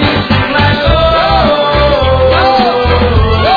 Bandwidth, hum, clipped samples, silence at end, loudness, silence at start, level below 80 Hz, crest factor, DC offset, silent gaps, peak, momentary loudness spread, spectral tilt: 5 kHz; none; under 0.1%; 0 s; -9 LUFS; 0 s; -18 dBFS; 8 dB; under 0.1%; none; 0 dBFS; 2 LU; -7.5 dB/octave